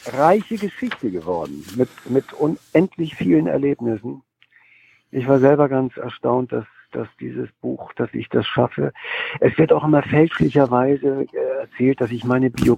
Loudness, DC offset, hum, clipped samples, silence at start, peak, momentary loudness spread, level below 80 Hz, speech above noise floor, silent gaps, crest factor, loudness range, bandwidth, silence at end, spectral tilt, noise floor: -20 LUFS; under 0.1%; none; under 0.1%; 0.05 s; -2 dBFS; 13 LU; -52 dBFS; 36 dB; none; 18 dB; 5 LU; 14.5 kHz; 0 s; -8 dB/octave; -55 dBFS